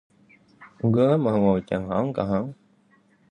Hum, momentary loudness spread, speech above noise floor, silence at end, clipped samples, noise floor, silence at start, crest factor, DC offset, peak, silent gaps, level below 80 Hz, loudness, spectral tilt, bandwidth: none; 8 LU; 39 dB; 0.8 s; under 0.1%; -61 dBFS; 0.6 s; 16 dB; under 0.1%; -8 dBFS; none; -52 dBFS; -23 LUFS; -9.5 dB/octave; 9 kHz